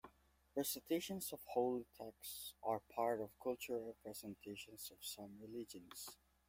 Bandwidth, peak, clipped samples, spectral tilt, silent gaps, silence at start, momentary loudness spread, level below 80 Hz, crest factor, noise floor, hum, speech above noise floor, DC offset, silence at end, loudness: 16.5 kHz; -26 dBFS; under 0.1%; -3.5 dB/octave; none; 0.05 s; 12 LU; -78 dBFS; 20 dB; -72 dBFS; none; 27 dB; under 0.1%; 0.35 s; -46 LUFS